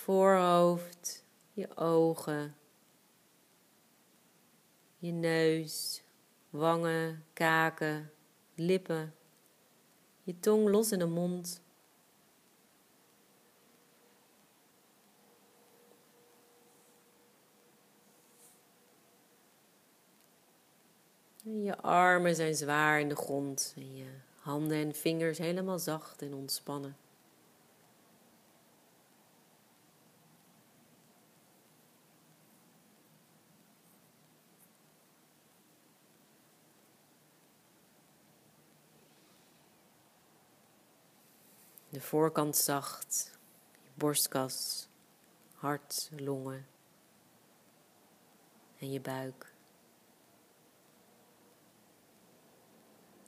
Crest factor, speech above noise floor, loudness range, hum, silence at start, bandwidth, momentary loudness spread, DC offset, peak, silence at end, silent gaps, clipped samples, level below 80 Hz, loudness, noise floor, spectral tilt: 24 dB; 35 dB; 16 LU; none; 0 s; 15.5 kHz; 20 LU; under 0.1%; -12 dBFS; 3.95 s; none; under 0.1%; -90 dBFS; -33 LUFS; -67 dBFS; -4 dB/octave